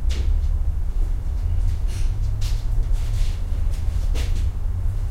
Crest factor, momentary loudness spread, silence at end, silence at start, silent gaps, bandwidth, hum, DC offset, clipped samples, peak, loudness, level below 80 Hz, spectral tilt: 12 dB; 3 LU; 0 s; 0 s; none; 10.5 kHz; none; 1%; under 0.1%; -10 dBFS; -26 LUFS; -20 dBFS; -6 dB/octave